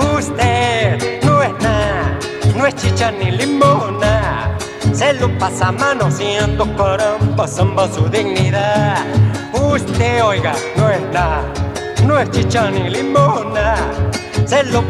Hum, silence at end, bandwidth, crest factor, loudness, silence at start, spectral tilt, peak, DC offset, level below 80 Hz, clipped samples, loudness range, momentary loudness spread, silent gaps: none; 0 s; 12.5 kHz; 14 dB; -15 LUFS; 0 s; -5.5 dB/octave; 0 dBFS; under 0.1%; -30 dBFS; under 0.1%; 1 LU; 5 LU; none